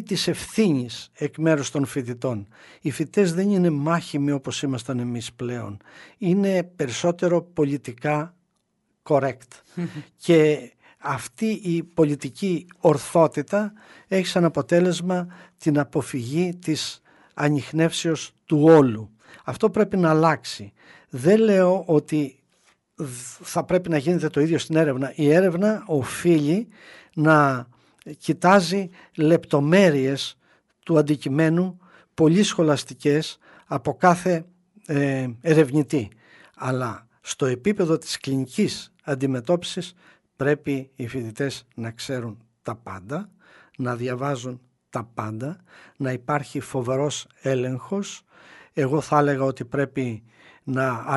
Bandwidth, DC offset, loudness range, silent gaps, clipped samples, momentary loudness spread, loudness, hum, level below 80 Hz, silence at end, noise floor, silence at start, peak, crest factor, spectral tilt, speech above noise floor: 11.5 kHz; under 0.1%; 8 LU; none; under 0.1%; 15 LU; -23 LUFS; none; -62 dBFS; 0 s; -72 dBFS; 0 s; -2 dBFS; 20 dB; -6 dB/octave; 50 dB